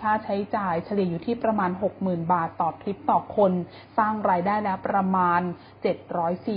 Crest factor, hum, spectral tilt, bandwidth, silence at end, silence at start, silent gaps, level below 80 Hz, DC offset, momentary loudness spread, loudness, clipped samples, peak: 18 dB; none; -11.5 dB/octave; 5.2 kHz; 0 s; 0 s; none; -58 dBFS; under 0.1%; 7 LU; -25 LUFS; under 0.1%; -8 dBFS